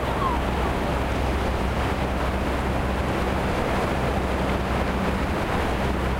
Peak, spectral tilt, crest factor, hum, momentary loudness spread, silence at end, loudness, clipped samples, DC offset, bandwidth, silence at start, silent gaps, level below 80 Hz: -10 dBFS; -6 dB/octave; 14 dB; none; 1 LU; 0 s; -25 LUFS; under 0.1%; under 0.1%; 16 kHz; 0 s; none; -30 dBFS